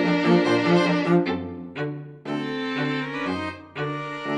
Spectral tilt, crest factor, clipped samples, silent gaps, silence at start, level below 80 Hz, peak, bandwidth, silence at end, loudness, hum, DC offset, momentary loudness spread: -6.5 dB/octave; 18 dB; under 0.1%; none; 0 s; -66 dBFS; -6 dBFS; 9.4 kHz; 0 s; -24 LUFS; none; under 0.1%; 12 LU